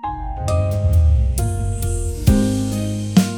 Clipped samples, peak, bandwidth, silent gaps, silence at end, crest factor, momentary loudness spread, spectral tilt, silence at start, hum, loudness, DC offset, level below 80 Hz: under 0.1%; 0 dBFS; 19.5 kHz; none; 0 s; 16 dB; 7 LU; -6.5 dB/octave; 0 s; none; -19 LUFS; under 0.1%; -22 dBFS